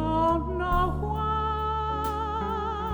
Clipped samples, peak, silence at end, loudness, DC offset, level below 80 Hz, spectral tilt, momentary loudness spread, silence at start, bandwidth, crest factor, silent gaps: under 0.1%; -14 dBFS; 0 s; -27 LUFS; under 0.1%; -34 dBFS; -7.5 dB/octave; 5 LU; 0 s; over 20 kHz; 14 dB; none